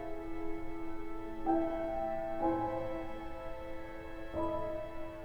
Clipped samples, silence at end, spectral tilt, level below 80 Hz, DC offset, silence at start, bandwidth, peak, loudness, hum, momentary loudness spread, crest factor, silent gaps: under 0.1%; 0 s; -8 dB/octave; -48 dBFS; under 0.1%; 0 s; 5.8 kHz; -20 dBFS; -39 LUFS; none; 11 LU; 16 dB; none